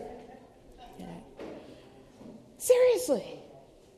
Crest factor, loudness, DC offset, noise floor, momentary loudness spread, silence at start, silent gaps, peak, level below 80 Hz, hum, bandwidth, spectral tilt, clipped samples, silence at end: 22 dB; -26 LUFS; under 0.1%; -54 dBFS; 28 LU; 0 s; none; -10 dBFS; -62 dBFS; none; 13.5 kHz; -3.5 dB/octave; under 0.1%; 0.55 s